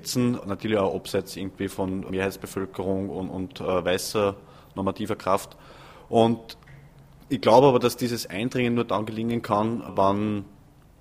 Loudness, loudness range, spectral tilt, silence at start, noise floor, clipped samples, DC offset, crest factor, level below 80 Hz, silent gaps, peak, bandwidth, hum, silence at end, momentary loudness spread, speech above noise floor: -25 LUFS; 6 LU; -5.5 dB/octave; 0 s; -50 dBFS; under 0.1%; under 0.1%; 22 dB; -56 dBFS; none; -2 dBFS; 15.5 kHz; none; 0.5 s; 11 LU; 25 dB